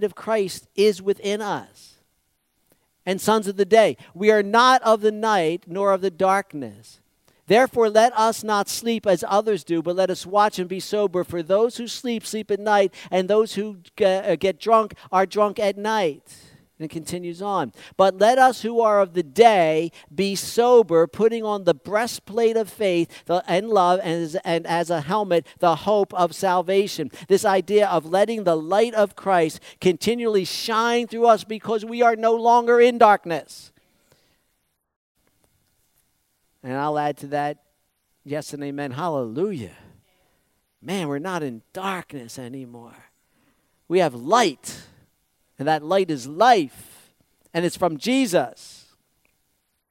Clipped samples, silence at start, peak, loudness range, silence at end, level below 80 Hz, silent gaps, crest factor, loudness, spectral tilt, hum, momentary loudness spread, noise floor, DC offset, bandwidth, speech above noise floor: under 0.1%; 0 s; -2 dBFS; 11 LU; 1.2 s; -66 dBFS; 34.96-35.15 s; 20 dB; -21 LUFS; -4.5 dB/octave; none; 14 LU; -72 dBFS; under 0.1%; 16.5 kHz; 51 dB